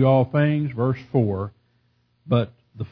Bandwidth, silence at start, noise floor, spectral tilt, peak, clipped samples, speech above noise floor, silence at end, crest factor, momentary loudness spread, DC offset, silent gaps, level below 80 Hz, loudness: 5.4 kHz; 0 s; -65 dBFS; -10.5 dB/octave; -6 dBFS; under 0.1%; 45 dB; 0.05 s; 16 dB; 14 LU; under 0.1%; none; -58 dBFS; -23 LUFS